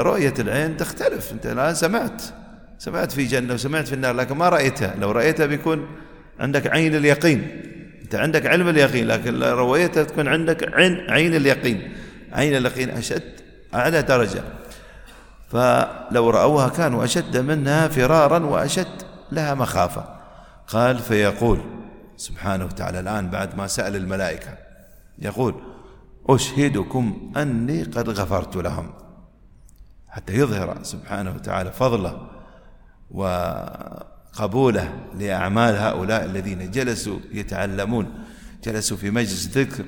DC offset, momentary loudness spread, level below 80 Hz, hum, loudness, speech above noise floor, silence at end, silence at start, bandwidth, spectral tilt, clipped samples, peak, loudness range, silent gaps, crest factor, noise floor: under 0.1%; 17 LU; -42 dBFS; none; -21 LUFS; 28 dB; 0 s; 0 s; 19 kHz; -5.5 dB/octave; under 0.1%; 0 dBFS; 8 LU; none; 20 dB; -48 dBFS